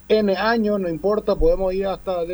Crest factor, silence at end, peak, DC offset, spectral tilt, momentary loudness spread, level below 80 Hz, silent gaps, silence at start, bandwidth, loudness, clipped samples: 14 dB; 0 s; -6 dBFS; under 0.1%; -7.5 dB/octave; 5 LU; -32 dBFS; none; 0.1 s; over 20 kHz; -21 LUFS; under 0.1%